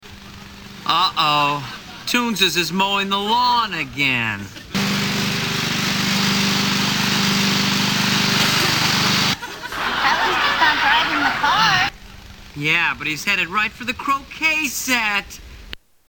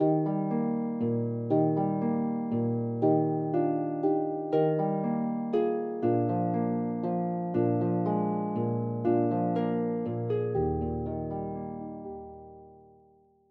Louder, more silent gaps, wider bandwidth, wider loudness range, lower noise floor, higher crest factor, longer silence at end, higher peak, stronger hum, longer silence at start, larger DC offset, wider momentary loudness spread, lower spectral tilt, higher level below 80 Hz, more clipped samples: first, -18 LUFS vs -29 LUFS; neither; first, over 20 kHz vs 4.5 kHz; about the same, 3 LU vs 4 LU; second, -39 dBFS vs -62 dBFS; about the same, 16 dB vs 16 dB; second, 0.35 s vs 0.75 s; first, -2 dBFS vs -14 dBFS; neither; about the same, 0.05 s vs 0 s; neither; first, 11 LU vs 8 LU; second, -2.5 dB/octave vs -12 dB/octave; first, -46 dBFS vs -54 dBFS; neither